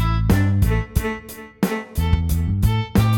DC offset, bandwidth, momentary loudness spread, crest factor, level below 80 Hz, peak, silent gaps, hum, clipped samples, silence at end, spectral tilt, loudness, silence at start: under 0.1%; 18.5 kHz; 8 LU; 16 dB; -24 dBFS; -4 dBFS; none; none; under 0.1%; 0 s; -6.5 dB/octave; -21 LUFS; 0 s